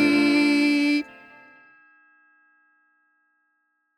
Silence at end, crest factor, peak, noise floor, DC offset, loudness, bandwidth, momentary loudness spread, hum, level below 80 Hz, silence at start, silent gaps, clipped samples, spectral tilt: 2.95 s; 18 dB; -8 dBFS; -73 dBFS; under 0.1%; -20 LUFS; 13 kHz; 8 LU; none; -72 dBFS; 0 s; none; under 0.1%; -4 dB/octave